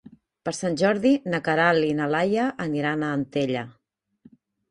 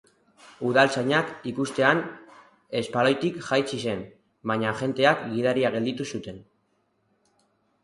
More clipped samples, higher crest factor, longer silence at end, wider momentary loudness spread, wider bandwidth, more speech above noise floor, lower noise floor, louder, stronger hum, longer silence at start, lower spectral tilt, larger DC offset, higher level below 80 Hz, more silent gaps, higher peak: neither; about the same, 18 dB vs 22 dB; second, 1 s vs 1.45 s; second, 10 LU vs 13 LU; about the same, 11 kHz vs 11.5 kHz; second, 34 dB vs 46 dB; second, -57 dBFS vs -70 dBFS; about the same, -24 LUFS vs -25 LUFS; neither; about the same, 0.45 s vs 0.45 s; about the same, -5.5 dB/octave vs -5 dB/octave; neither; about the same, -64 dBFS vs -64 dBFS; neither; about the same, -6 dBFS vs -4 dBFS